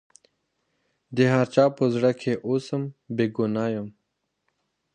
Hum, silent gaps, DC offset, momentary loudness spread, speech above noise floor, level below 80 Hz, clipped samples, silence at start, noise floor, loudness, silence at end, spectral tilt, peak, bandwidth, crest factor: none; none; under 0.1%; 11 LU; 54 dB; -68 dBFS; under 0.1%; 1.1 s; -78 dBFS; -24 LUFS; 1.05 s; -7.5 dB/octave; -6 dBFS; 9.4 kHz; 20 dB